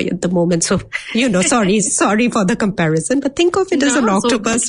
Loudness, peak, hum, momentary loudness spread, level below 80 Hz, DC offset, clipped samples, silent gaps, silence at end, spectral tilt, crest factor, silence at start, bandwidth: -15 LUFS; -2 dBFS; none; 4 LU; -46 dBFS; under 0.1%; under 0.1%; none; 0 s; -4 dB/octave; 12 dB; 0 s; 11 kHz